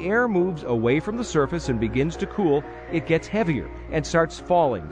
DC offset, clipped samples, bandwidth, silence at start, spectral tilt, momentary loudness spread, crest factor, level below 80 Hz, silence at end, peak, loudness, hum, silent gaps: under 0.1%; under 0.1%; 9.8 kHz; 0 s; -6.5 dB/octave; 6 LU; 16 dB; -42 dBFS; 0 s; -8 dBFS; -24 LUFS; none; none